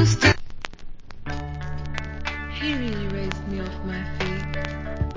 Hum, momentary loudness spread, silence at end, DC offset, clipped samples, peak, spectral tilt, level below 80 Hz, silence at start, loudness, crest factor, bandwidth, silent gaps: none; 14 LU; 0 s; under 0.1%; under 0.1%; -2 dBFS; -5 dB/octave; -34 dBFS; 0 s; -27 LUFS; 22 dB; 7.6 kHz; none